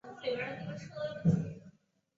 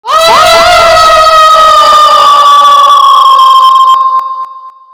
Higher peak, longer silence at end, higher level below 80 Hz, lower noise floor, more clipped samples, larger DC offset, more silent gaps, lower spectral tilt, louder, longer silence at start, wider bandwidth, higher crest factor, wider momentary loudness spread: second, -16 dBFS vs 0 dBFS; first, 0.5 s vs 0.25 s; second, -64 dBFS vs -34 dBFS; first, -63 dBFS vs -25 dBFS; second, under 0.1% vs 20%; neither; neither; first, -7 dB/octave vs -0.5 dB/octave; second, -36 LUFS vs -2 LUFS; about the same, 0.05 s vs 0.05 s; second, 7.6 kHz vs over 20 kHz; first, 20 dB vs 4 dB; first, 12 LU vs 6 LU